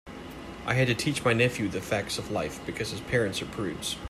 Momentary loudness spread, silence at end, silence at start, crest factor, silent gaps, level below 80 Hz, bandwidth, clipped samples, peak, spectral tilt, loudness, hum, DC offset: 11 LU; 0 s; 0.05 s; 20 dB; none; -50 dBFS; 15 kHz; under 0.1%; -10 dBFS; -4.5 dB/octave; -28 LUFS; none; under 0.1%